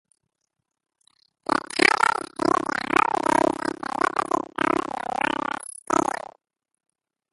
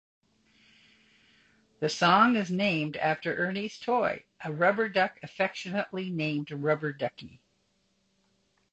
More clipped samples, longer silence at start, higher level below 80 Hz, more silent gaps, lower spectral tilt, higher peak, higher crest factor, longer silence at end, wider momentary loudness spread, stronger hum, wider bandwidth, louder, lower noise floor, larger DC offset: neither; second, 1.5 s vs 1.8 s; first, -62 dBFS vs -70 dBFS; neither; second, -3 dB/octave vs -5.5 dB/octave; first, 0 dBFS vs -10 dBFS; about the same, 26 dB vs 22 dB; second, 1.15 s vs 1.35 s; about the same, 10 LU vs 11 LU; neither; first, 12 kHz vs 8.6 kHz; first, -23 LUFS vs -28 LUFS; first, -80 dBFS vs -72 dBFS; neither